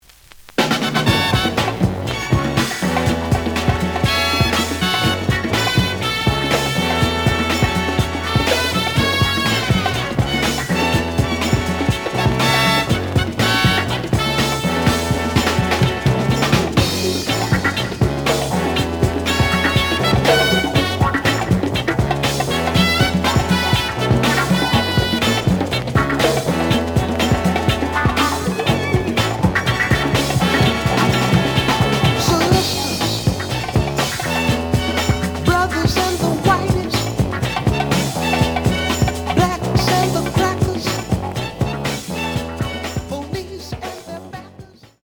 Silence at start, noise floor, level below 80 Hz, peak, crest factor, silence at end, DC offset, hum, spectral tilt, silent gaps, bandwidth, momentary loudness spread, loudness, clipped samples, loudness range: 0.6 s; -43 dBFS; -32 dBFS; -2 dBFS; 16 dB; 0.4 s; under 0.1%; none; -5 dB/octave; none; over 20 kHz; 5 LU; -17 LUFS; under 0.1%; 2 LU